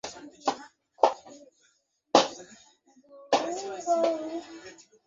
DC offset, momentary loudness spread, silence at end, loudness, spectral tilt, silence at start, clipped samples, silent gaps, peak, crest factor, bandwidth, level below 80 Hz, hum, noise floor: under 0.1%; 21 LU; 0.35 s; -28 LUFS; -2.5 dB/octave; 0.05 s; under 0.1%; none; -4 dBFS; 26 dB; 8 kHz; -76 dBFS; none; -70 dBFS